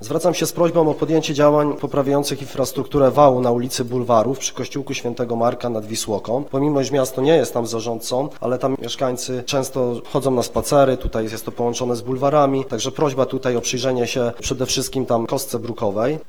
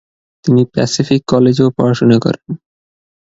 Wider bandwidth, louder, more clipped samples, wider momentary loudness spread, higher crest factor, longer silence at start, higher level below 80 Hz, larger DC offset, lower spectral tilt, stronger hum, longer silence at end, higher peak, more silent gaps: first, 20 kHz vs 8 kHz; second, -20 LUFS vs -13 LUFS; neither; second, 8 LU vs 12 LU; first, 20 dB vs 14 dB; second, 0 s vs 0.45 s; first, -44 dBFS vs -50 dBFS; first, 2% vs under 0.1%; second, -5 dB/octave vs -6.5 dB/octave; neither; second, 0.05 s vs 0.8 s; about the same, 0 dBFS vs 0 dBFS; neither